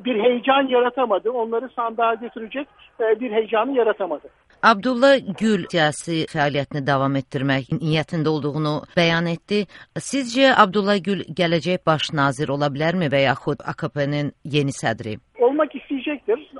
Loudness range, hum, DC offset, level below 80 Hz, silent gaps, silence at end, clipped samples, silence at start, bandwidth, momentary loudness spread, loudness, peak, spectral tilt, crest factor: 3 LU; none; under 0.1%; -58 dBFS; none; 0 s; under 0.1%; 0 s; 11.5 kHz; 10 LU; -21 LUFS; 0 dBFS; -5.5 dB/octave; 20 dB